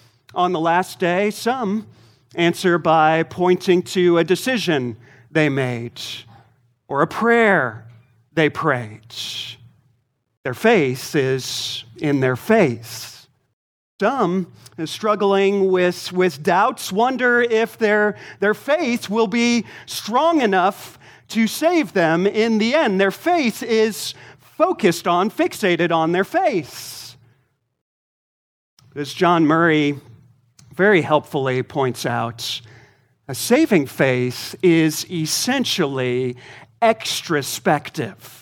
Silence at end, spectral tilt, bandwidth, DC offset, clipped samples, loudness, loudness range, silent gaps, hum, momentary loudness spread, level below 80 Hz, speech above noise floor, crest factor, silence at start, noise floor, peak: 0.1 s; -5 dB/octave; 19 kHz; under 0.1%; under 0.1%; -19 LUFS; 4 LU; 10.37-10.44 s, 13.53-13.99 s, 27.81-28.77 s; none; 13 LU; -66 dBFS; 46 dB; 18 dB; 0.35 s; -65 dBFS; -2 dBFS